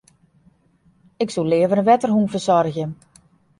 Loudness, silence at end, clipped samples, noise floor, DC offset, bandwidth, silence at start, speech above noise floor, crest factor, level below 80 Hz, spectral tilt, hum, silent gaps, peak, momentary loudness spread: -19 LUFS; 0.65 s; under 0.1%; -59 dBFS; under 0.1%; 11.5 kHz; 1.2 s; 41 dB; 18 dB; -60 dBFS; -6.5 dB/octave; none; none; -2 dBFS; 11 LU